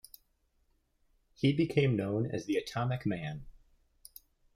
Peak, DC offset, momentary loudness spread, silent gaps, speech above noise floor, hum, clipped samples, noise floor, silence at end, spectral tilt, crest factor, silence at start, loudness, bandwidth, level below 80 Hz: -14 dBFS; under 0.1%; 22 LU; none; 42 dB; none; under 0.1%; -73 dBFS; 1.05 s; -7 dB/octave; 20 dB; 1.4 s; -32 LUFS; 16 kHz; -62 dBFS